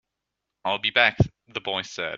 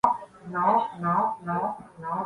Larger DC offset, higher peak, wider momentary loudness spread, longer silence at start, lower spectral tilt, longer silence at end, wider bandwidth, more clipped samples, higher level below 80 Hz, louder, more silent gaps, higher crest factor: neither; first, -2 dBFS vs -6 dBFS; about the same, 12 LU vs 10 LU; first, 0.65 s vs 0.05 s; second, -5 dB/octave vs -8 dB/octave; about the same, 0 s vs 0 s; second, 7.8 kHz vs 11 kHz; neither; first, -48 dBFS vs -64 dBFS; first, -24 LUFS vs -27 LUFS; neither; about the same, 24 dB vs 20 dB